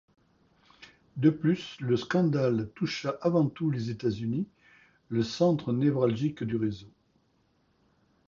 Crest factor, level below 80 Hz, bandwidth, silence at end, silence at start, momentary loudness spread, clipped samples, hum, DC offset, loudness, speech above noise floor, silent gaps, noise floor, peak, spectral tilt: 18 dB; -62 dBFS; 7.4 kHz; 1.4 s; 0.8 s; 8 LU; under 0.1%; none; under 0.1%; -29 LUFS; 42 dB; none; -70 dBFS; -10 dBFS; -7.5 dB/octave